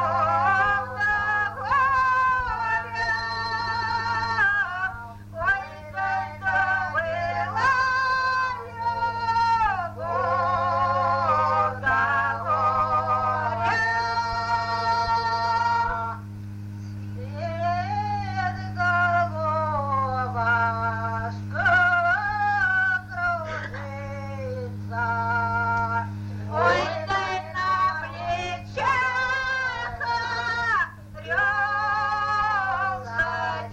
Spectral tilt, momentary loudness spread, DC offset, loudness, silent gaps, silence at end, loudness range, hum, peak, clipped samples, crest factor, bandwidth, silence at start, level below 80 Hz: -5 dB/octave; 9 LU; under 0.1%; -24 LUFS; none; 0 s; 4 LU; none; -8 dBFS; under 0.1%; 16 dB; 9.4 kHz; 0 s; -48 dBFS